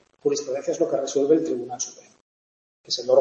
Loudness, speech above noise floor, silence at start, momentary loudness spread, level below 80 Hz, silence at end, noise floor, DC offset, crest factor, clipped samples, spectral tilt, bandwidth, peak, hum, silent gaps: -24 LUFS; over 67 dB; 0.25 s; 10 LU; -74 dBFS; 0 s; under -90 dBFS; under 0.1%; 20 dB; under 0.1%; -3.5 dB/octave; 8.2 kHz; -4 dBFS; none; 2.21-2.84 s